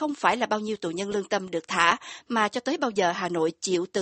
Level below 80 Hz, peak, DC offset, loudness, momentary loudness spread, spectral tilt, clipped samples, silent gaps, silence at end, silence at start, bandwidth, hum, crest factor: -66 dBFS; -4 dBFS; under 0.1%; -26 LUFS; 7 LU; -3.5 dB/octave; under 0.1%; none; 0 s; 0 s; 8.8 kHz; none; 22 dB